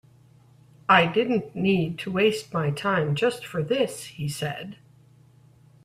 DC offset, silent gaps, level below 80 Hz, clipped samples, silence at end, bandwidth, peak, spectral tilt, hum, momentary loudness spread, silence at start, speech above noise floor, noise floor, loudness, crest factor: under 0.1%; none; -62 dBFS; under 0.1%; 1.1 s; 15 kHz; -4 dBFS; -5.5 dB/octave; none; 13 LU; 0.9 s; 31 dB; -55 dBFS; -24 LUFS; 22 dB